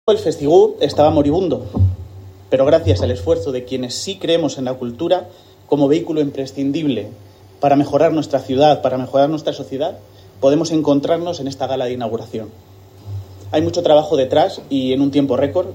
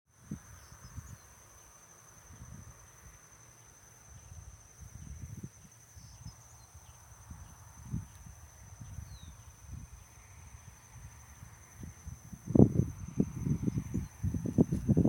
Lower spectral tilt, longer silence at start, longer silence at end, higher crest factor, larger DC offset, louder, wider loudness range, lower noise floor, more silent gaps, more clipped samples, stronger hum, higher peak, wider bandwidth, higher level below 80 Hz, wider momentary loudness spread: second, -6.5 dB/octave vs -8 dB/octave; second, 0.05 s vs 0.3 s; about the same, 0 s vs 0 s; second, 16 dB vs 32 dB; neither; first, -17 LUFS vs -33 LUFS; second, 3 LU vs 20 LU; second, -36 dBFS vs -57 dBFS; neither; neither; neither; first, 0 dBFS vs -6 dBFS; about the same, 16 kHz vs 17 kHz; about the same, -50 dBFS vs -50 dBFS; second, 10 LU vs 24 LU